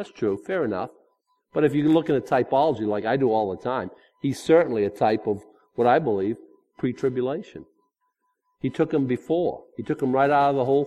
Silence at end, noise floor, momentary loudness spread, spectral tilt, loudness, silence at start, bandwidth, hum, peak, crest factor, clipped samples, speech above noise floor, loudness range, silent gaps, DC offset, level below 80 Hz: 0 s; -74 dBFS; 12 LU; -7.5 dB/octave; -24 LUFS; 0 s; 13 kHz; none; -6 dBFS; 18 dB; under 0.1%; 51 dB; 5 LU; none; under 0.1%; -62 dBFS